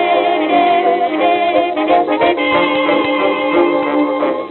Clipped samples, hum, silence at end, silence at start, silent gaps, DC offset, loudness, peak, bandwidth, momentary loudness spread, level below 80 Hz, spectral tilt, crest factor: under 0.1%; none; 0 s; 0 s; none; under 0.1%; -14 LUFS; 0 dBFS; 4.3 kHz; 3 LU; -58 dBFS; -7.5 dB/octave; 12 dB